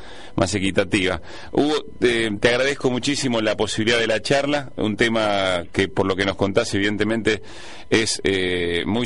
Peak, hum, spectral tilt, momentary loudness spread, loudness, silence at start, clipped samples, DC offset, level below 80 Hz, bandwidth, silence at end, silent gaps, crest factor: -6 dBFS; none; -4 dB/octave; 5 LU; -21 LUFS; 0 s; under 0.1%; 2%; -46 dBFS; 11.5 kHz; 0 s; none; 16 dB